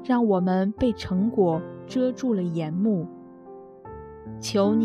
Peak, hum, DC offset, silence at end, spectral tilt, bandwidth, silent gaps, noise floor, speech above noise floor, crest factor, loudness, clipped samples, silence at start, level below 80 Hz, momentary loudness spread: -10 dBFS; none; under 0.1%; 0 s; -7 dB/octave; 13 kHz; none; -44 dBFS; 21 dB; 16 dB; -25 LUFS; under 0.1%; 0 s; -52 dBFS; 21 LU